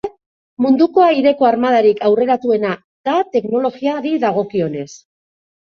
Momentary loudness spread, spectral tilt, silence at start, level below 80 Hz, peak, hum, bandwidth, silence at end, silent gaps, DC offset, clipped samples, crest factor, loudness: 10 LU; -6.5 dB/octave; 0.05 s; -60 dBFS; -2 dBFS; none; 7.2 kHz; 0.65 s; 0.26-0.57 s, 2.84-3.04 s; under 0.1%; under 0.1%; 14 dB; -15 LUFS